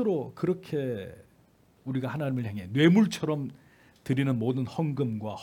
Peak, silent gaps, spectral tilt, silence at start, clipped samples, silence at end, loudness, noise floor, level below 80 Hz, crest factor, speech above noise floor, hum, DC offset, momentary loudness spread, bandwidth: -8 dBFS; none; -7 dB/octave; 0 s; under 0.1%; 0 s; -28 LUFS; -62 dBFS; -68 dBFS; 20 dB; 34 dB; none; under 0.1%; 15 LU; 17 kHz